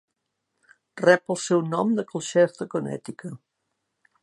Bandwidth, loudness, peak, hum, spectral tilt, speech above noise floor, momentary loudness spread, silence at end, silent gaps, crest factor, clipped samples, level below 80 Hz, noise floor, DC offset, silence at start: 11.5 kHz; -24 LUFS; -2 dBFS; none; -5 dB/octave; 56 dB; 16 LU; 0.85 s; none; 22 dB; under 0.1%; -76 dBFS; -79 dBFS; under 0.1%; 0.95 s